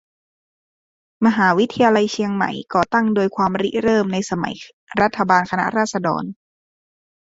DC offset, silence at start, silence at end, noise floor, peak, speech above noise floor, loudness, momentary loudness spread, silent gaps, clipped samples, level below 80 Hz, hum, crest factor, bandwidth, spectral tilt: under 0.1%; 1.2 s; 0.95 s; under -90 dBFS; 0 dBFS; over 72 dB; -19 LUFS; 9 LU; 4.73-4.87 s; under 0.1%; -56 dBFS; none; 20 dB; 8 kHz; -5.5 dB/octave